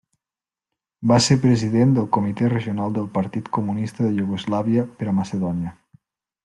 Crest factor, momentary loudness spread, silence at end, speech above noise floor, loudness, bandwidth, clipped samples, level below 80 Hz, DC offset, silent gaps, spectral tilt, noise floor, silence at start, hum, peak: 18 dB; 8 LU; 0.75 s; over 70 dB; -21 LUFS; 11.5 kHz; under 0.1%; -56 dBFS; under 0.1%; none; -6 dB/octave; under -90 dBFS; 1 s; none; -4 dBFS